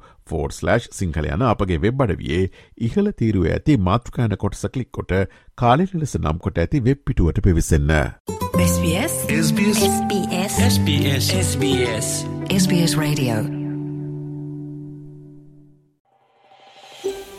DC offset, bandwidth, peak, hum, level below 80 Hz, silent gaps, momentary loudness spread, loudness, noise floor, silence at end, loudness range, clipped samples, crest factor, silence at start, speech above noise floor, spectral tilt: under 0.1%; 15.5 kHz; -2 dBFS; none; -34 dBFS; 8.20-8.25 s, 16.00-16.05 s; 12 LU; -20 LUFS; -55 dBFS; 0 s; 7 LU; under 0.1%; 18 dB; 0.3 s; 36 dB; -5.5 dB/octave